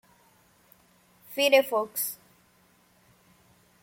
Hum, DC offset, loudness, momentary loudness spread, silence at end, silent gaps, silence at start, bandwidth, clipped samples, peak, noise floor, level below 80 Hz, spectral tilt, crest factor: none; under 0.1%; -25 LUFS; 16 LU; 1.7 s; none; 1.3 s; 16.5 kHz; under 0.1%; -6 dBFS; -63 dBFS; -78 dBFS; -1 dB/octave; 24 dB